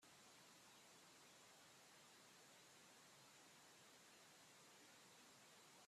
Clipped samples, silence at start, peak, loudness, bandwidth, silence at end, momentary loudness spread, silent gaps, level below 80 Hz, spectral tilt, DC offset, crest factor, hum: under 0.1%; 0 s; -56 dBFS; -66 LUFS; 14.5 kHz; 0 s; 0 LU; none; under -90 dBFS; -1.5 dB/octave; under 0.1%; 14 dB; none